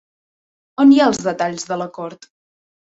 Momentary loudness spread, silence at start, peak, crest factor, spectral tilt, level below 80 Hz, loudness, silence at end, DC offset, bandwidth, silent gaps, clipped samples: 20 LU; 0.8 s; -2 dBFS; 16 dB; -4.5 dB/octave; -60 dBFS; -16 LUFS; 0.75 s; under 0.1%; 8 kHz; none; under 0.1%